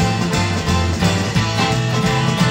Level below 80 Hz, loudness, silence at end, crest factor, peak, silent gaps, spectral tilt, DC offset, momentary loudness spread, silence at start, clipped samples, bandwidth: -32 dBFS; -17 LUFS; 0 s; 14 dB; -4 dBFS; none; -5 dB/octave; under 0.1%; 1 LU; 0 s; under 0.1%; 16.5 kHz